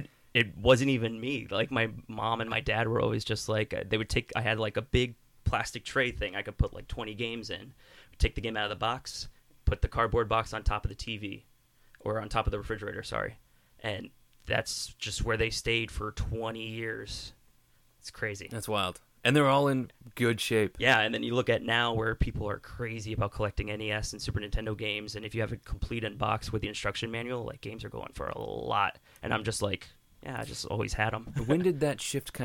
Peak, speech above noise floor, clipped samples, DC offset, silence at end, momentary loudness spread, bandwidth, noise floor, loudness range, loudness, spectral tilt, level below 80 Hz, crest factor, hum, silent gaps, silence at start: -10 dBFS; 33 dB; under 0.1%; under 0.1%; 0 s; 12 LU; 17.5 kHz; -64 dBFS; 7 LU; -31 LUFS; -5 dB/octave; -42 dBFS; 22 dB; none; none; 0 s